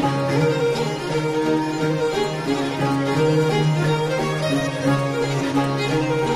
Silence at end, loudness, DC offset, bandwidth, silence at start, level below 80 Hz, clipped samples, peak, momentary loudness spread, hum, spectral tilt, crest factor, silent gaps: 0 s; -21 LUFS; under 0.1%; 14.5 kHz; 0 s; -48 dBFS; under 0.1%; -6 dBFS; 4 LU; none; -6 dB/octave; 14 dB; none